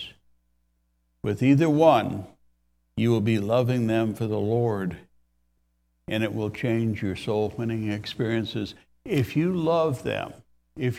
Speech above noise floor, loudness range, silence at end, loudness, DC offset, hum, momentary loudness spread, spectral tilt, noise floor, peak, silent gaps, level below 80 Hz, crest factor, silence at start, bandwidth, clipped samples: 47 dB; 5 LU; 0 s; -25 LUFS; under 0.1%; none; 14 LU; -7.5 dB/octave; -71 dBFS; -6 dBFS; none; -58 dBFS; 20 dB; 0 s; 15 kHz; under 0.1%